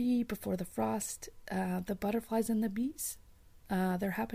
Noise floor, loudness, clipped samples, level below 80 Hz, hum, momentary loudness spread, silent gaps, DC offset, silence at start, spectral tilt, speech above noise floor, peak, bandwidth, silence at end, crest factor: -57 dBFS; -35 LUFS; under 0.1%; -58 dBFS; none; 7 LU; none; under 0.1%; 0 s; -5.5 dB/octave; 23 dB; -20 dBFS; 16 kHz; 0 s; 14 dB